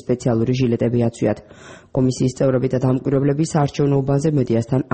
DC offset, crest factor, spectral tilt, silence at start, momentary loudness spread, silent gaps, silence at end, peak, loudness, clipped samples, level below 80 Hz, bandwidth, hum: 0.1%; 12 dB; -7.5 dB/octave; 0.05 s; 3 LU; none; 0.1 s; -6 dBFS; -19 LUFS; under 0.1%; -46 dBFS; 8.8 kHz; none